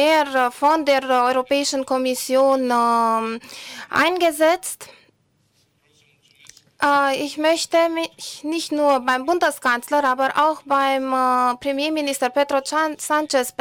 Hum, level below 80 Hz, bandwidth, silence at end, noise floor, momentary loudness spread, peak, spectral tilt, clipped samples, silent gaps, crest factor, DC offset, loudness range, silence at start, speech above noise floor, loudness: none; -64 dBFS; 19.5 kHz; 0.1 s; -64 dBFS; 7 LU; -8 dBFS; -2 dB/octave; under 0.1%; none; 12 dB; under 0.1%; 4 LU; 0 s; 44 dB; -19 LUFS